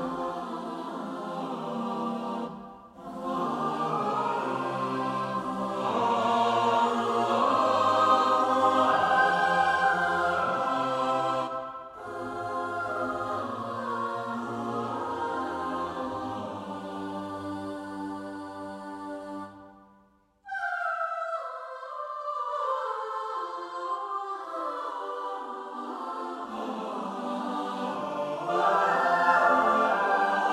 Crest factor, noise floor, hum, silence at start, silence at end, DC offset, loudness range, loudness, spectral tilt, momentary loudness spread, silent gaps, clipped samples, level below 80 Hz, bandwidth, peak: 20 dB; -63 dBFS; none; 0 s; 0 s; under 0.1%; 12 LU; -28 LUFS; -5 dB/octave; 14 LU; none; under 0.1%; -70 dBFS; 14.5 kHz; -8 dBFS